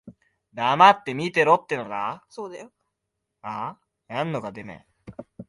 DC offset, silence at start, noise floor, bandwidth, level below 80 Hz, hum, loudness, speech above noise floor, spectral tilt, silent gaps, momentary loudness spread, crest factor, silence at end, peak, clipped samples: under 0.1%; 0.05 s; -81 dBFS; 11.5 kHz; -66 dBFS; none; -22 LUFS; 58 dB; -5 dB/octave; none; 26 LU; 22 dB; 0.05 s; -2 dBFS; under 0.1%